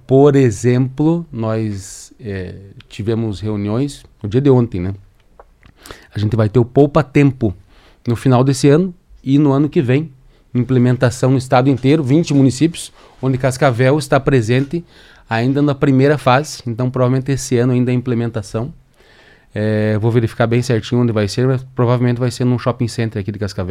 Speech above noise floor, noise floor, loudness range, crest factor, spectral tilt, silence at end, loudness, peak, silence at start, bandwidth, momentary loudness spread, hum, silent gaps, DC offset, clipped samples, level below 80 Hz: 32 dB; -47 dBFS; 5 LU; 16 dB; -7 dB/octave; 0 s; -16 LUFS; 0 dBFS; 0.1 s; 13 kHz; 12 LU; none; none; under 0.1%; under 0.1%; -44 dBFS